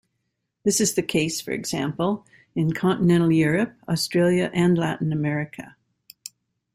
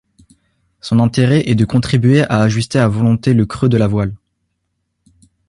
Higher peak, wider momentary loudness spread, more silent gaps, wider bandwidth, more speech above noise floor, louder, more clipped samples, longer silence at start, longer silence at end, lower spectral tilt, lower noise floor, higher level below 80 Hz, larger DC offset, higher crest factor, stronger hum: second, -8 dBFS vs 0 dBFS; first, 14 LU vs 5 LU; neither; first, 16 kHz vs 11.5 kHz; about the same, 55 dB vs 57 dB; second, -23 LUFS vs -14 LUFS; neither; second, 0.65 s vs 0.85 s; second, 1.05 s vs 1.3 s; second, -5 dB/octave vs -7 dB/octave; first, -77 dBFS vs -70 dBFS; second, -58 dBFS vs -42 dBFS; neither; about the same, 16 dB vs 14 dB; neither